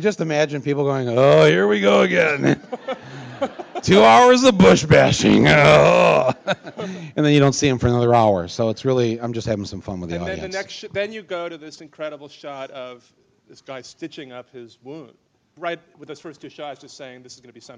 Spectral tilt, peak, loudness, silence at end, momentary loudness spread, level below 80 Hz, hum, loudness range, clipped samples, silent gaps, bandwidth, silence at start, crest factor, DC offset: -5.5 dB/octave; 0 dBFS; -16 LUFS; 0.05 s; 25 LU; -48 dBFS; none; 22 LU; under 0.1%; none; 9.8 kHz; 0 s; 18 dB; under 0.1%